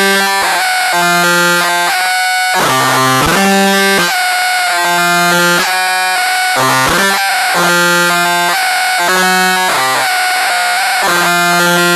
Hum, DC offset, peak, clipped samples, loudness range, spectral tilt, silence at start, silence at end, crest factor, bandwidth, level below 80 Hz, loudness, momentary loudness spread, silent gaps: none; under 0.1%; -2 dBFS; under 0.1%; 1 LU; -2 dB/octave; 0 s; 0 s; 10 dB; 13.5 kHz; -44 dBFS; -10 LUFS; 2 LU; none